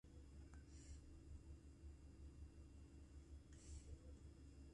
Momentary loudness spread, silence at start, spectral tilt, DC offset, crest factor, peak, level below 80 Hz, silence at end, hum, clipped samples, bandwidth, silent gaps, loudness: 3 LU; 0.05 s; -6 dB/octave; under 0.1%; 14 dB; -46 dBFS; -62 dBFS; 0 s; none; under 0.1%; 11 kHz; none; -63 LUFS